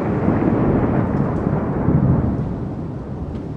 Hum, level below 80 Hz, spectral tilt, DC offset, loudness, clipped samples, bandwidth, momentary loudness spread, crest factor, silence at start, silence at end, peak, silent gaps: none; -32 dBFS; -11 dB/octave; under 0.1%; -20 LUFS; under 0.1%; 5.4 kHz; 11 LU; 14 dB; 0 s; 0 s; -4 dBFS; none